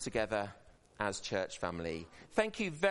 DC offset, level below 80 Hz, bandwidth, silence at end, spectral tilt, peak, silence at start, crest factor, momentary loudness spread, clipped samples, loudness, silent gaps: under 0.1%; -62 dBFS; 11.5 kHz; 0 s; -4 dB/octave; -18 dBFS; 0 s; 20 dB; 8 LU; under 0.1%; -37 LUFS; none